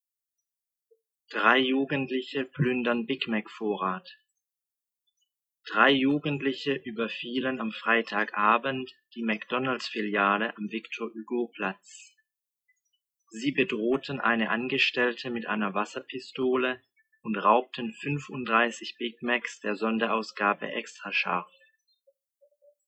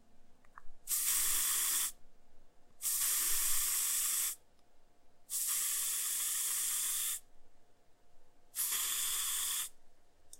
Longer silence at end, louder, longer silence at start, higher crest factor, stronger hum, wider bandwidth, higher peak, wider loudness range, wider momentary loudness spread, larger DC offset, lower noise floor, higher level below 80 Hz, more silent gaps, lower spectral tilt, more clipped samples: first, 1.4 s vs 0.05 s; first, -28 LUFS vs -32 LUFS; first, 1.3 s vs 0 s; about the same, 24 dB vs 20 dB; neither; second, 8.6 kHz vs 16 kHz; first, -6 dBFS vs -18 dBFS; about the same, 4 LU vs 3 LU; first, 11 LU vs 8 LU; neither; first, -90 dBFS vs -58 dBFS; second, -76 dBFS vs -58 dBFS; neither; first, -5 dB/octave vs 3 dB/octave; neither